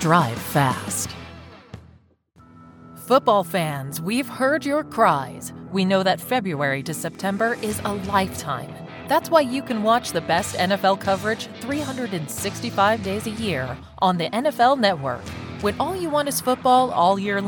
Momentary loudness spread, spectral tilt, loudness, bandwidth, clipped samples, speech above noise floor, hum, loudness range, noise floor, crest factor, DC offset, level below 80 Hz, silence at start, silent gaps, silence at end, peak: 10 LU; -4.5 dB/octave; -22 LUFS; 19 kHz; under 0.1%; 33 dB; none; 3 LU; -54 dBFS; 20 dB; under 0.1%; -52 dBFS; 0 s; none; 0 s; -2 dBFS